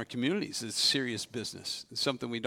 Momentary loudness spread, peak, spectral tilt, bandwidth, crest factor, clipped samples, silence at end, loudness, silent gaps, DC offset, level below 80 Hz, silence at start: 10 LU; -14 dBFS; -3 dB/octave; 18.5 kHz; 20 dB; under 0.1%; 0 s; -31 LUFS; none; under 0.1%; -74 dBFS; 0 s